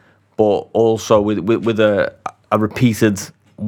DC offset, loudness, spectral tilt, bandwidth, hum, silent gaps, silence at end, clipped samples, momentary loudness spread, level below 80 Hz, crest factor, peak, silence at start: under 0.1%; -16 LUFS; -6 dB/octave; 18 kHz; none; none; 0 s; under 0.1%; 10 LU; -50 dBFS; 16 dB; 0 dBFS; 0.4 s